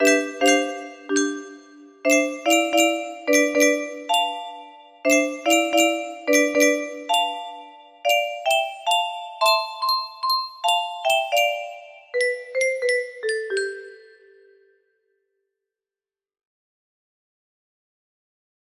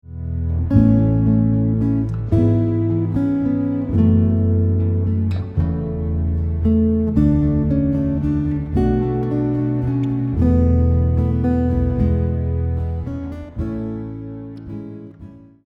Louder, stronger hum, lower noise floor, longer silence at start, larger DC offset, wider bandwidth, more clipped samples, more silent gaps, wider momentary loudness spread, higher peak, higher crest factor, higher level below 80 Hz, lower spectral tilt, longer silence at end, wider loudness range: about the same, -21 LUFS vs -19 LUFS; neither; first, under -90 dBFS vs -40 dBFS; about the same, 0 s vs 0.05 s; neither; first, 15.5 kHz vs 3.9 kHz; neither; neither; about the same, 12 LU vs 12 LU; about the same, -4 dBFS vs -2 dBFS; about the same, 20 dB vs 16 dB; second, -74 dBFS vs -28 dBFS; second, 0 dB/octave vs -11.5 dB/octave; first, 4.8 s vs 0.3 s; about the same, 6 LU vs 4 LU